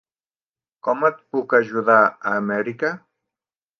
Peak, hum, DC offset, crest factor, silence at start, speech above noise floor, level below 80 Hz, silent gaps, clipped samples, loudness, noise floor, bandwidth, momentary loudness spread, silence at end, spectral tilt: 0 dBFS; none; under 0.1%; 22 dB; 0.85 s; over 70 dB; -74 dBFS; none; under 0.1%; -20 LUFS; under -90 dBFS; 6.6 kHz; 11 LU; 0.85 s; -7.5 dB/octave